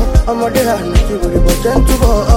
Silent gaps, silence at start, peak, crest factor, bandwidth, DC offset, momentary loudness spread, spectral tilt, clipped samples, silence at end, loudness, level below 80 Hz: none; 0 s; 0 dBFS; 10 dB; 17 kHz; under 0.1%; 3 LU; -6 dB/octave; under 0.1%; 0 s; -13 LUFS; -14 dBFS